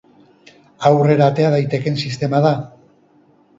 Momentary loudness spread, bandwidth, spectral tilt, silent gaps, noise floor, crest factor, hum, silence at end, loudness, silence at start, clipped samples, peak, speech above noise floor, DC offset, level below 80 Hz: 8 LU; 7.8 kHz; -7.5 dB/octave; none; -53 dBFS; 18 dB; none; 0.9 s; -16 LUFS; 0.8 s; under 0.1%; 0 dBFS; 38 dB; under 0.1%; -58 dBFS